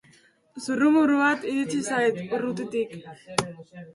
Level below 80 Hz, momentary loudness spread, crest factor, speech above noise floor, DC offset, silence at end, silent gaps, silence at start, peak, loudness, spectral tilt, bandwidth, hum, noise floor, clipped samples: -66 dBFS; 17 LU; 22 dB; 34 dB; under 0.1%; 0.05 s; none; 0.55 s; -2 dBFS; -25 LUFS; -4.5 dB/octave; 11.5 kHz; none; -59 dBFS; under 0.1%